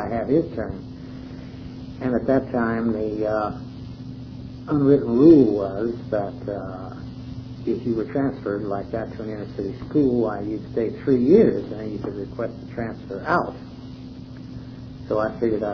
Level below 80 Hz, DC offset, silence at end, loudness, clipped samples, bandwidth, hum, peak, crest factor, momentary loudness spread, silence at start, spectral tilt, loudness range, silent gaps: -46 dBFS; under 0.1%; 0 s; -22 LUFS; under 0.1%; 5.4 kHz; none; -2 dBFS; 20 dB; 21 LU; 0 s; -9.5 dB/octave; 8 LU; none